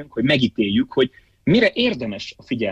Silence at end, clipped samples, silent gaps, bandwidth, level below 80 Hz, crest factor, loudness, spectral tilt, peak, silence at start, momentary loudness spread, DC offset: 0 s; under 0.1%; none; 8 kHz; -48 dBFS; 14 dB; -20 LUFS; -6.5 dB/octave; -6 dBFS; 0 s; 11 LU; under 0.1%